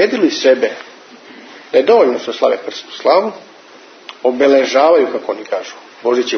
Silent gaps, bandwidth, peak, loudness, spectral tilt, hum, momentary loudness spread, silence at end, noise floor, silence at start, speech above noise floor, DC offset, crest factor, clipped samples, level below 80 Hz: none; 6.6 kHz; 0 dBFS; -14 LUFS; -3.5 dB/octave; none; 14 LU; 0 s; -40 dBFS; 0 s; 27 dB; under 0.1%; 14 dB; under 0.1%; -68 dBFS